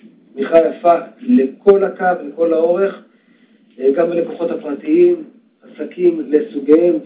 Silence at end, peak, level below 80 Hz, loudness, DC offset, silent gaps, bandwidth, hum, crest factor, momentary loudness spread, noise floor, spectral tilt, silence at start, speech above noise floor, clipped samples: 0 s; 0 dBFS; -62 dBFS; -15 LUFS; under 0.1%; none; 4 kHz; none; 14 dB; 10 LU; -52 dBFS; -11 dB/octave; 0.35 s; 37 dB; under 0.1%